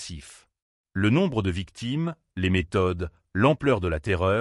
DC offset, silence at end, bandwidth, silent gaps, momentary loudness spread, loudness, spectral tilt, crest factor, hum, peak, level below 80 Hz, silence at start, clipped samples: under 0.1%; 0 s; 11.5 kHz; 0.62-0.84 s; 11 LU; -25 LUFS; -7 dB/octave; 16 dB; none; -8 dBFS; -44 dBFS; 0 s; under 0.1%